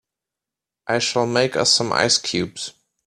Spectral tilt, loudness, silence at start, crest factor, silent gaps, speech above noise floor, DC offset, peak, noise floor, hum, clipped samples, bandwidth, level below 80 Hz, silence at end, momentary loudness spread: -2.5 dB/octave; -19 LUFS; 0.85 s; 20 dB; none; 67 dB; under 0.1%; -2 dBFS; -87 dBFS; none; under 0.1%; 13.5 kHz; -60 dBFS; 0.35 s; 15 LU